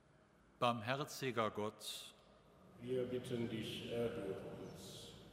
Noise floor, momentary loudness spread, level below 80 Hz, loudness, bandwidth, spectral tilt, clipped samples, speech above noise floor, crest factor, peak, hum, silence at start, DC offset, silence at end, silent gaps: -69 dBFS; 13 LU; -72 dBFS; -43 LUFS; 16 kHz; -5 dB/octave; under 0.1%; 27 dB; 24 dB; -20 dBFS; none; 0.6 s; under 0.1%; 0 s; none